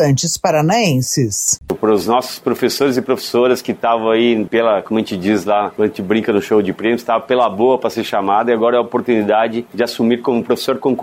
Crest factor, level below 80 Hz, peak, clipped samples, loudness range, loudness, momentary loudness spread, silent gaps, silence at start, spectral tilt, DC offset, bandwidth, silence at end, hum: 12 dB; -54 dBFS; -2 dBFS; under 0.1%; 1 LU; -16 LUFS; 4 LU; none; 0 s; -4.5 dB/octave; under 0.1%; 16 kHz; 0 s; none